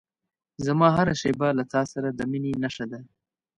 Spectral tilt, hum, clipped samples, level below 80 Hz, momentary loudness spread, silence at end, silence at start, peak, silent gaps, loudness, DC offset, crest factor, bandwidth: -6.5 dB/octave; none; under 0.1%; -56 dBFS; 13 LU; 0.55 s; 0.6 s; -6 dBFS; none; -25 LUFS; under 0.1%; 20 dB; 10.5 kHz